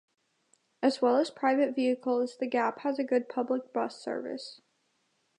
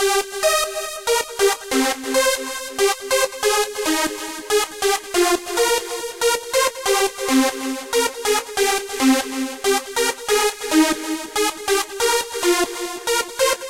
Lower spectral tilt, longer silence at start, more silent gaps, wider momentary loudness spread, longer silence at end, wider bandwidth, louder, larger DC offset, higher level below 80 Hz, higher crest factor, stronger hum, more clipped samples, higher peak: first, -4.5 dB/octave vs -0.5 dB/octave; first, 0.8 s vs 0 s; neither; first, 10 LU vs 4 LU; first, 0.85 s vs 0 s; second, 10.5 kHz vs 16.5 kHz; second, -30 LUFS vs -20 LUFS; second, under 0.1% vs 0.2%; second, -86 dBFS vs -50 dBFS; about the same, 18 dB vs 16 dB; neither; neither; second, -12 dBFS vs -4 dBFS